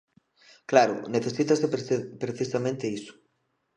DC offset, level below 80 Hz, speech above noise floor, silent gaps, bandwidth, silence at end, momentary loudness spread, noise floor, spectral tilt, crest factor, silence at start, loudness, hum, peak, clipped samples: under 0.1%; -74 dBFS; 49 dB; none; 10 kHz; 0.65 s; 14 LU; -75 dBFS; -5.5 dB/octave; 24 dB; 0.7 s; -26 LUFS; none; -4 dBFS; under 0.1%